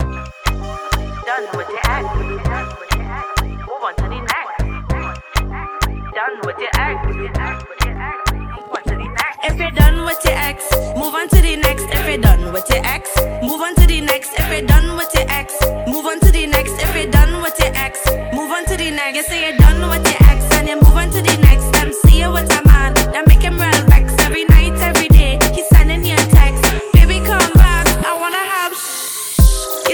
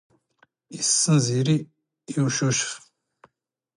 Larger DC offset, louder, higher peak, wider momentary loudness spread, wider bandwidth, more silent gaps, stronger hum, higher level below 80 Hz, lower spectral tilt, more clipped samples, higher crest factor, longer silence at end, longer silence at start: neither; first, -15 LUFS vs -22 LUFS; first, 0 dBFS vs -8 dBFS; about the same, 11 LU vs 13 LU; first, over 20 kHz vs 11.5 kHz; neither; neither; first, -14 dBFS vs -66 dBFS; about the same, -4.5 dB/octave vs -4 dB/octave; first, 0.6% vs under 0.1%; second, 12 dB vs 18 dB; second, 0 s vs 1 s; second, 0 s vs 0.7 s